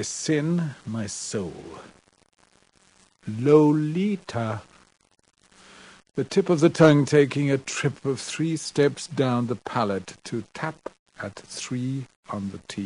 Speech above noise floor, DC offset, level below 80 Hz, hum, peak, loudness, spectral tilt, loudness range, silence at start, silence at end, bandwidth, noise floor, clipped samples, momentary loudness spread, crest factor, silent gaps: 37 dB; under 0.1%; -62 dBFS; none; -4 dBFS; -24 LUFS; -6 dB/octave; 9 LU; 0 s; 0 s; 10.5 kHz; -61 dBFS; under 0.1%; 18 LU; 22 dB; 10.99-11.06 s, 12.16-12.23 s